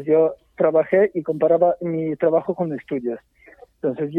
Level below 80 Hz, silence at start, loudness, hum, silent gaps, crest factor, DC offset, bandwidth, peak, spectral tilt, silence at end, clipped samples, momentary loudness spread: -62 dBFS; 0 s; -21 LUFS; none; none; 16 dB; under 0.1%; 3.7 kHz; -4 dBFS; -10.5 dB/octave; 0 s; under 0.1%; 10 LU